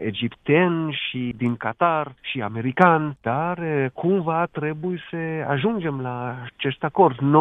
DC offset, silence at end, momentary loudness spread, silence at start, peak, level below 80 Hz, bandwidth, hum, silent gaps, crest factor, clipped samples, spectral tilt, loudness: under 0.1%; 0 s; 11 LU; 0 s; 0 dBFS; -60 dBFS; 4 kHz; none; none; 22 dB; under 0.1%; -9 dB/octave; -23 LUFS